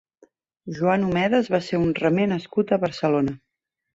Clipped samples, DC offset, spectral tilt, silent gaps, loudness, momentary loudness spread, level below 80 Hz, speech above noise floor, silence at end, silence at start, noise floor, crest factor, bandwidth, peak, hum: under 0.1%; under 0.1%; -7.5 dB/octave; none; -22 LUFS; 7 LU; -56 dBFS; 37 dB; 0.6 s; 0.65 s; -59 dBFS; 18 dB; 7.8 kHz; -6 dBFS; none